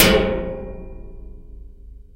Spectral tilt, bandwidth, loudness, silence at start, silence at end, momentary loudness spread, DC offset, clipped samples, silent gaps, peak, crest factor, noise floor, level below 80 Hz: -4 dB/octave; 16 kHz; -20 LUFS; 0 s; 0.15 s; 26 LU; under 0.1%; under 0.1%; none; 0 dBFS; 22 dB; -40 dBFS; -32 dBFS